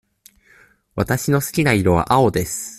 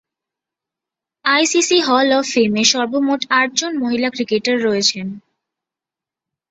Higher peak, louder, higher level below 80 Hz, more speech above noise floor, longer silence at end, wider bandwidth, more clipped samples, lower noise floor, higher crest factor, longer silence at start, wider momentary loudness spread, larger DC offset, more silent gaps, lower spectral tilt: about the same, -2 dBFS vs 0 dBFS; about the same, -18 LUFS vs -16 LUFS; first, -42 dBFS vs -62 dBFS; second, 35 dB vs 71 dB; second, 0 s vs 1.3 s; first, 16 kHz vs 8.2 kHz; neither; second, -53 dBFS vs -87 dBFS; about the same, 18 dB vs 18 dB; second, 0.95 s vs 1.25 s; about the same, 8 LU vs 6 LU; neither; neither; first, -5.5 dB/octave vs -2.5 dB/octave